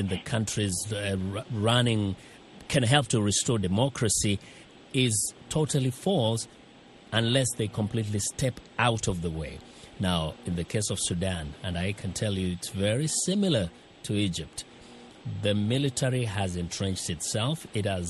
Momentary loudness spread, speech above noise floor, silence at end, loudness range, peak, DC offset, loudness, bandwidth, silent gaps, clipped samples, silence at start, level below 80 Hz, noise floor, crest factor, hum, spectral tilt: 10 LU; 24 dB; 0 s; 4 LU; -6 dBFS; under 0.1%; -28 LUFS; 12.5 kHz; none; under 0.1%; 0 s; -50 dBFS; -52 dBFS; 22 dB; none; -4.5 dB/octave